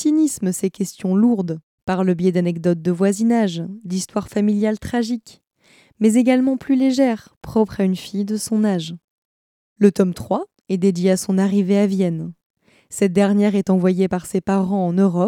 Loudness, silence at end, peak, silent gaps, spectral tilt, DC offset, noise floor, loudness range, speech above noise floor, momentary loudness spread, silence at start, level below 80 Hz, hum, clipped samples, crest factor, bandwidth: -19 LUFS; 0 s; -2 dBFS; 1.63-1.87 s, 7.37-7.41 s, 9.04-9.76 s, 12.45-12.55 s; -6.5 dB/octave; under 0.1%; under -90 dBFS; 2 LU; over 72 dB; 9 LU; 0 s; -54 dBFS; none; under 0.1%; 18 dB; 15.5 kHz